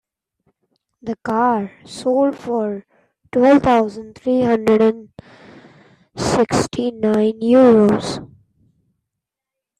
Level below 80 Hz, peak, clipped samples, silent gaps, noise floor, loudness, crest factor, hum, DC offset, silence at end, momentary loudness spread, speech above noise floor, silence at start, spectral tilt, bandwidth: -50 dBFS; -2 dBFS; under 0.1%; none; -84 dBFS; -17 LUFS; 16 dB; none; under 0.1%; 1.55 s; 17 LU; 68 dB; 1.05 s; -6 dB/octave; 12 kHz